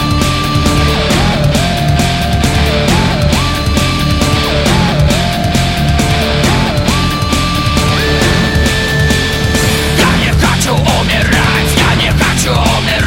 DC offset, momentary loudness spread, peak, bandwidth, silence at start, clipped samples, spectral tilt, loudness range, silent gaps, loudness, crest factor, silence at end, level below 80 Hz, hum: under 0.1%; 2 LU; 0 dBFS; 16.5 kHz; 0 s; under 0.1%; -4.5 dB/octave; 1 LU; none; -11 LUFS; 10 dB; 0 s; -18 dBFS; none